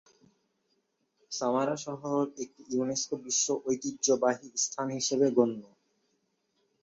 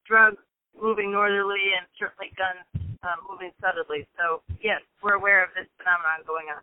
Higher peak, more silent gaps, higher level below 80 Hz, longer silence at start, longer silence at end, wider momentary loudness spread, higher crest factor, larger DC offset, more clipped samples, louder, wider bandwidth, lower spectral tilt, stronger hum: second, -10 dBFS vs -6 dBFS; neither; second, -76 dBFS vs -54 dBFS; first, 1.3 s vs 0.1 s; first, 1.2 s vs 0 s; second, 9 LU vs 14 LU; about the same, 22 dB vs 20 dB; neither; neither; second, -30 LUFS vs -24 LUFS; first, 8 kHz vs 4 kHz; second, -3.5 dB/octave vs -8.5 dB/octave; neither